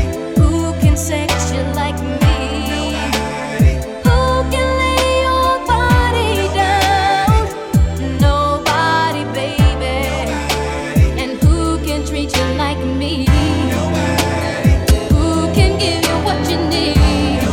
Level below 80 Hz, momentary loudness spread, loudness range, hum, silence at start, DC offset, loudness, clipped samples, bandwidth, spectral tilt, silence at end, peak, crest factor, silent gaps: -20 dBFS; 5 LU; 3 LU; none; 0 s; under 0.1%; -15 LUFS; under 0.1%; 17.5 kHz; -5.5 dB/octave; 0 s; 0 dBFS; 14 dB; none